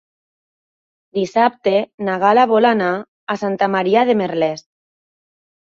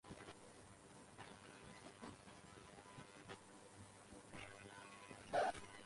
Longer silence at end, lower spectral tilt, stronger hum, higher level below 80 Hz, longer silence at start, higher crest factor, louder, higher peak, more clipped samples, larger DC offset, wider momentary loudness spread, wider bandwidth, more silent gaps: first, 1.2 s vs 0 s; first, -6 dB/octave vs -4 dB/octave; neither; first, -64 dBFS vs -74 dBFS; first, 1.15 s vs 0.05 s; second, 16 dB vs 22 dB; first, -17 LUFS vs -53 LUFS; first, -2 dBFS vs -30 dBFS; neither; neither; second, 11 LU vs 17 LU; second, 7.8 kHz vs 11.5 kHz; first, 1.94-1.98 s, 3.08-3.27 s vs none